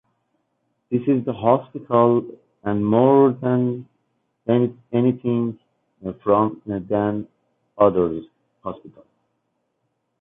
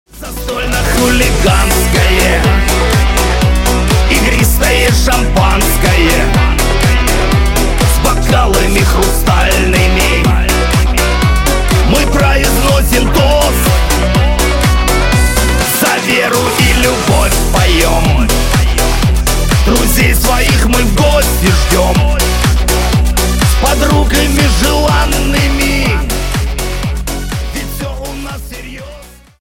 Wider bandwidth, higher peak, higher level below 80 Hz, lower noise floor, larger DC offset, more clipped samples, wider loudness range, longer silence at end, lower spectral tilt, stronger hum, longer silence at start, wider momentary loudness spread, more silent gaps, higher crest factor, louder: second, 3.8 kHz vs 17 kHz; second, -4 dBFS vs 0 dBFS; second, -56 dBFS vs -14 dBFS; first, -73 dBFS vs -34 dBFS; neither; neither; first, 5 LU vs 1 LU; first, 1.3 s vs 0.35 s; first, -12 dB/octave vs -4 dB/octave; neither; first, 0.9 s vs 0.15 s; first, 17 LU vs 7 LU; neither; first, 18 dB vs 10 dB; second, -20 LUFS vs -11 LUFS